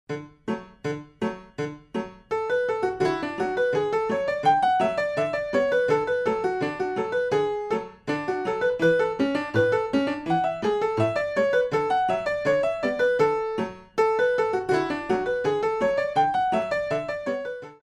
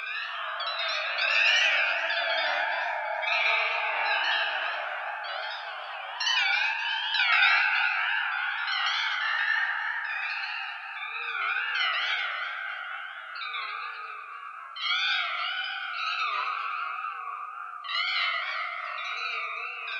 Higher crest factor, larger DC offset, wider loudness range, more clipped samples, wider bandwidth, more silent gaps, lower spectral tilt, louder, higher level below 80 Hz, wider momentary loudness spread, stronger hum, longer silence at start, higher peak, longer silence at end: about the same, 16 dB vs 20 dB; neither; second, 2 LU vs 6 LU; neither; about the same, 11 kHz vs 10.5 kHz; neither; first, -6 dB/octave vs 3.5 dB/octave; about the same, -25 LUFS vs -27 LUFS; first, -58 dBFS vs under -90 dBFS; second, 10 LU vs 13 LU; neither; about the same, 0.1 s vs 0 s; about the same, -10 dBFS vs -8 dBFS; about the same, 0.1 s vs 0 s